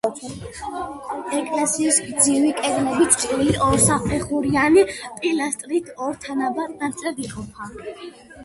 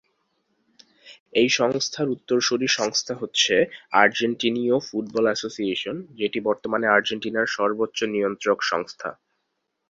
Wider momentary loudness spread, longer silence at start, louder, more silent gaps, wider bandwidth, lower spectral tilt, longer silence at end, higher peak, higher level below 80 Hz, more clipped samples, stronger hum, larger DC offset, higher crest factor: first, 18 LU vs 8 LU; second, 0.05 s vs 1.05 s; first, -20 LUFS vs -23 LUFS; second, none vs 1.20-1.26 s; first, 12 kHz vs 7.8 kHz; about the same, -3.5 dB/octave vs -3 dB/octave; second, 0 s vs 0.75 s; about the same, -2 dBFS vs -2 dBFS; first, -44 dBFS vs -66 dBFS; neither; neither; neither; about the same, 20 dB vs 22 dB